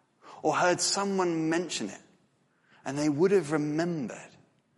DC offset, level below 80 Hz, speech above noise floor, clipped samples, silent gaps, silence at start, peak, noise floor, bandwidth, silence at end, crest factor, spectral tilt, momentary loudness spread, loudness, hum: under 0.1%; -74 dBFS; 41 dB; under 0.1%; none; 0.25 s; -12 dBFS; -69 dBFS; 11.5 kHz; 0.5 s; 16 dB; -4 dB/octave; 15 LU; -28 LUFS; none